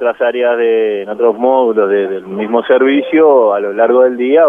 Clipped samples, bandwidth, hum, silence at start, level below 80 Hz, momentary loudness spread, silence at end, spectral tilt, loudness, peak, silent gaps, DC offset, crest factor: under 0.1%; 3.7 kHz; none; 0 s; -62 dBFS; 7 LU; 0 s; -7.5 dB/octave; -12 LUFS; 0 dBFS; none; under 0.1%; 10 dB